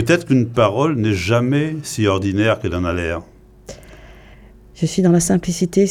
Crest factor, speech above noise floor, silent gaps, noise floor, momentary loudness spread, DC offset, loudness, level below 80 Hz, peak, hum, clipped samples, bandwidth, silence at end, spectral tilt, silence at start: 16 dB; 26 dB; none; -43 dBFS; 10 LU; under 0.1%; -17 LUFS; -42 dBFS; -2 dBFS; none; under 0.1%; 15.5 kHz; 0 s; -6 dB/octave; 0 s